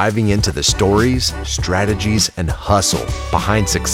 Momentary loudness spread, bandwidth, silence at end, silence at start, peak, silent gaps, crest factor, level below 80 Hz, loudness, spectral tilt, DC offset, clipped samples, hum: 6 LU; 16.5 kHz; 0 s; 0 s; 0 dBFS; none; 16 dB; -28 dBFS; -16 LUFS; -4 dB/octave; under 0.1%; under 0.1%; none